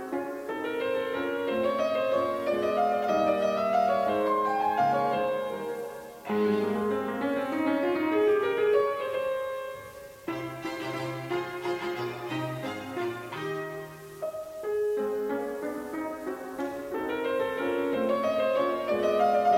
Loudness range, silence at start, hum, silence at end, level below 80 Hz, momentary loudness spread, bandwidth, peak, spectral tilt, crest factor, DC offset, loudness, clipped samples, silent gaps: 7 LU; 0 s; none; 0 s; -66 dBFS; 11 LU; 17 kHz; -12 dBFS; -6 dB/octave; 16 dB; under 0.1%; -29 LUFS; under 0.1%; none